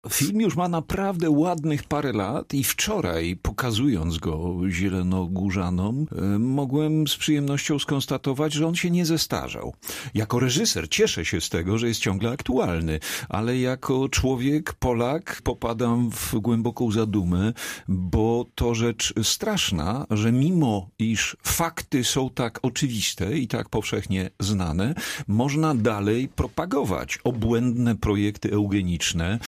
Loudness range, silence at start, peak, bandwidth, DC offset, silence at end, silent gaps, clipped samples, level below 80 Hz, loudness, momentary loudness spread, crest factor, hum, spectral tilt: 2 LU; 0.05 s; -8 dBFS; 15.5 kHz; under 0.1%; 0 s; none; under 0.1%; -42 dBFS; -24 LUFS; 5 LU; 14 dB; none; -5 dB/octave